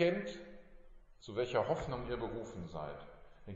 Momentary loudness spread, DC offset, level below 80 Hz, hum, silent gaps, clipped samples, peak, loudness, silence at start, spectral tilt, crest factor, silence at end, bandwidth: 22 LU; under 0.1%; -56 dBFS; none; none; under 0.1%; -20 dBFS; -39 LUFS; 0 s; -5 dB/octave; 20 dB; 0 s; 7.6 kHz